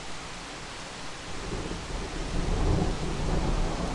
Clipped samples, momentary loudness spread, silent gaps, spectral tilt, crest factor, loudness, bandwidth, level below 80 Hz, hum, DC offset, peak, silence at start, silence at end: under 0.1%; 10 LU; none; -5 dB/octave; 18 dB; -33 LUFS; 11.5 kHz; -34 dBFS; none; under 0.1%; -12 dBFS; 0 s; 0 s